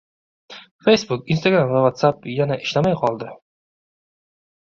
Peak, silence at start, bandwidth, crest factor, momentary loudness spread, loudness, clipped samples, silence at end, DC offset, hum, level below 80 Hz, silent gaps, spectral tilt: -2 dBFS; 0.5 s; 7.6 kHz; 20 dB; 7 LU; -19 LUFS; under 0.1%; 1.35 s; under 0.1%; none; -58 dBFS; 0.71-0.79 s; -6 dB/octave